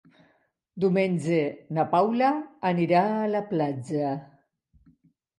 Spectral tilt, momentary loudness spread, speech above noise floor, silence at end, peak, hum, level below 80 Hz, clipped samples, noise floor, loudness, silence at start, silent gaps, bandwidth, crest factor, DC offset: -7.5 dB/octave; 7 LU; 43 dB; 1.15 s; -10 dBFS; none; -72 dBFS; under 0.1%; -68 dBFS; -26 LUFS; 0.75 s; none; 11.5 kHz; 18 dB; under 0.1%